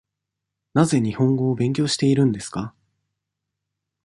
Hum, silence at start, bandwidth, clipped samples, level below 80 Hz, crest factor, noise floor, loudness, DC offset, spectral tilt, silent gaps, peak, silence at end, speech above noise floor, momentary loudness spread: none; 0.75 s; 11.5 kHz; under 0.1%; -56 dBFS; 20 dB; -83 dBFS; -21 LUFS; under 0.1%; -6 dB/octave; none; -2 dBFS; 1.35 s; 63 dB; 11 LU